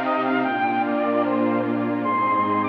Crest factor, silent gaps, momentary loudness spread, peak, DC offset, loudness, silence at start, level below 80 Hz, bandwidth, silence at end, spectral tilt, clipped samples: 12 dB; none; 2 LU; -10 dBFS; under 0.1%; -22 LUFS; 0 s; -82 dBFS; 5.4 kHz; 0 s; -8.5 dB/octave; under 0.1%